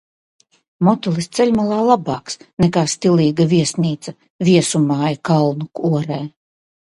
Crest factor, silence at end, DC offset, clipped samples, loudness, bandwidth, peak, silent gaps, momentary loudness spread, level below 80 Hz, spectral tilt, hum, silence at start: 16 dB; 0.65 s; under 0.1%; under 0.1%; -17 LUFS; 11.5 kHz; 0 dBFS; 2.53-2.57 s, 4.30-4.39 s; 11 LU; -52 dBFS; -6 dB/octave; none; 0.8 s